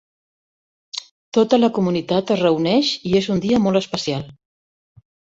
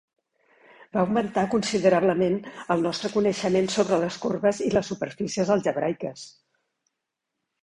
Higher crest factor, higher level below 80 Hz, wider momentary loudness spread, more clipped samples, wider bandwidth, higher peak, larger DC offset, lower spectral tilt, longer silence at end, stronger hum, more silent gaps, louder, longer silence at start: about the same, 18 dB vs 18 dB; about the same, -56 dBFS vs -60 dBFS; first, 15 LU vs 9 LU; neither; second, 8 kHz vs 11 kHz; first, -2 dBFS vs -6 dBFS; neither; about the same, -6 dB/octave vs -5.5 dB/octave; second, 1.05 s vs 1.35 s; neither; first, 1.11-1.32 s vs none; first, -19 LUFS vs -25 LUFS; first, 0.95 s vs 0.8 s